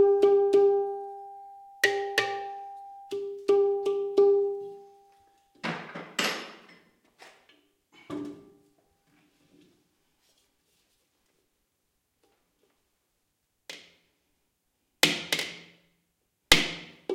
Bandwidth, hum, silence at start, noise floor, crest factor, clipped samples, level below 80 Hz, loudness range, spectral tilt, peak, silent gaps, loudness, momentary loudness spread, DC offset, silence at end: 16.5 kHz; none; 0 s; -77 dBFS; 30 dB; under 0.1%; -58 dBFS; 20 LU; -2.5 dB/octave; 0 dBFS; none; -26 LUFS; 23 LU; under 0.1%; 0 s